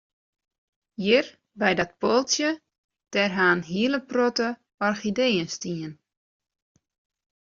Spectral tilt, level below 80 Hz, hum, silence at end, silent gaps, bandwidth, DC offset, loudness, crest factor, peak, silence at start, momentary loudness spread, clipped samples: -3 dB/octave; -66 dBFS; none; 1.55 s; 2.78-2.89 s, 4.74-4.78 s; 7.6 kHz; under 0.1%; -24 LUFS; 20 dB; -6 dBFS; 1 s; 11 LU; under 0.1%